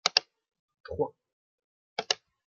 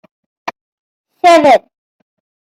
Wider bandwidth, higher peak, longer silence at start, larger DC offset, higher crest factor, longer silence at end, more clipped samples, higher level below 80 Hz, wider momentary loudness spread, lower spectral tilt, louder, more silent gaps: about the same, 11.5 kHz vs 12.5 kHz; about the same, -2 dBFS vs 0 dBFS; second, 0.05 s vs 0.45 s; neither; first, 32 dB vs 14 dB; second, 0.35 s vs 0.9 s; neither; second, -66 dBFS vs -60 dBFS; second, 12 LU vs 21 LU; second, -1 dB/octave vs -3.5 dB/octave; second, -32 LUFS vs -9 LUFS; first, 0.59-0.68 s, 0.80-0.84 s, 1.33-1.58 s, 1.64-1.96 s vs 0.61-1.04 s